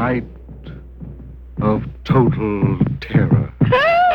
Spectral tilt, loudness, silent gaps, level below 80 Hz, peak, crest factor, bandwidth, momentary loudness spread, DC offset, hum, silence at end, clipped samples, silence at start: -9 dB/octave; -17 LUFS; none; -36 dBFS; -2 dBFS; 16 dB; 6 kHz; 21 LU; under 0.1%; none; 0 s; under 0.1%; 0 s